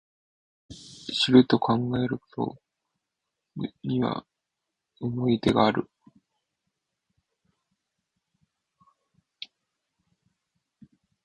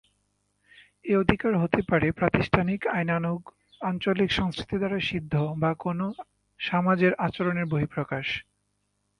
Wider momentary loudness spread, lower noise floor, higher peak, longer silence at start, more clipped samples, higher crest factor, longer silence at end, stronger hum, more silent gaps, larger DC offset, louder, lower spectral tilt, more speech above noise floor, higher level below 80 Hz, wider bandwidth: first, 24 LU vs 9 LU; first, -85 dBFS vs -75 dBFS; second, -4 dBFS vs 0 dBFS; second, 0.7 s vs 1.05 s; neither; about the same, 24 dB vs 26 dB; first, 5.4 s vs 0.8 s; second, none vs 50 Hz at -50 dBFS; neither; neither; about the same, -25 LUFS vs -26 LUFS; about the same, -6.5 dB/octave vs -7.5 dB/octave; first, 61 dB vs 49 dB; second, -60 dBFS vs -50 dBFS; about the same, 9.6 kHz vs 10 kHz